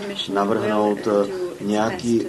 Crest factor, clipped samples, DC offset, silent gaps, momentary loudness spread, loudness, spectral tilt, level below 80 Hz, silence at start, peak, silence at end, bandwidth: 14 dB; under 0.1%; under 0.1%; none; 5 LU; -22 LUFS; -5.5 dB/octave; -58 dBFS; 0 s; -6 dBFS; 0 s; 12.5 kHz